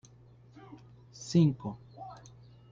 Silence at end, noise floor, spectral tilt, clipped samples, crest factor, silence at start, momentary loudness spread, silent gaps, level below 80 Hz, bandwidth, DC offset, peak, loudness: 0.55 s; -57 dBFS; -7.5 dB/octave; under 0.1%; 18 dB; 0.7 s; 26 LU; none; -66 dBFS; 7.6 kHz; under 0.1%; -16 dBFS; -29 LUFS